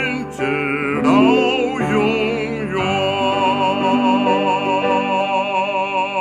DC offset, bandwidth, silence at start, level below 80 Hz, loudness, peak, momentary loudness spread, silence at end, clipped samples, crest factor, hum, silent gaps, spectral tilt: under 0.1%; 10 kHz; 0 s; -50 dBFS; -17 LUFS; -2 dBFS; 6 LU; 0 s; under 0.1%; 16 dB; none; none; -5.5 dB/octave